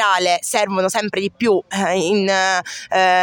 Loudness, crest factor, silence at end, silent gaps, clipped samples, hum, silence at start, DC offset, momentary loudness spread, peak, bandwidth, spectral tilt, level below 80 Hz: -18 LUFS; 14 dB; 0 s; none; under 0.1%; none; 0 s; under 0.1%; 5 LU; -2 dBFS; 17 kHz; -3 dB/octave; -64 dBFS